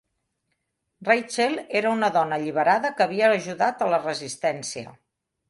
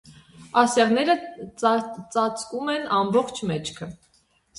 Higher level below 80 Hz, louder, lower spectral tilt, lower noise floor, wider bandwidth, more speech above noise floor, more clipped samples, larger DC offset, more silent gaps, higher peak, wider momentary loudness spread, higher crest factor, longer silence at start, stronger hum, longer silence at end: second, -72 dBFS vs -62 dBFS; about the same, -23 LUFS vs -23 LUFS; about the same, -4 dB/octave vs -4.5 dB/octave; first, -77 dBFS vs -64 dBFS; about the same, 11.5 kHz vs 11.5 kHz; first, 54 dB vs 41 dB; neither; neither; neither; about the same, -4 dBFS vs -4 dBFS; about the same, 10 LU vs 12 LU; about the same, 20 dB vs 22 dB; first, 1 s vs 0.05 s; neither; about the same, 0.6 s vs 0.65 s